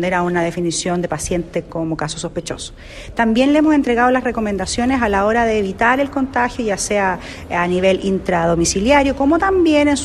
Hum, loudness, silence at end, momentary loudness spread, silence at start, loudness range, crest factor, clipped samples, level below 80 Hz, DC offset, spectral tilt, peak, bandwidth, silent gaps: none; -17 LUFS; 0 s; 10 LU; 0 s; 4 LU; 14 dB; under 0.1%; -36 dBFS; under 0.1%; -4.5 dB/octave; -2 dBFS; 13 kHz; none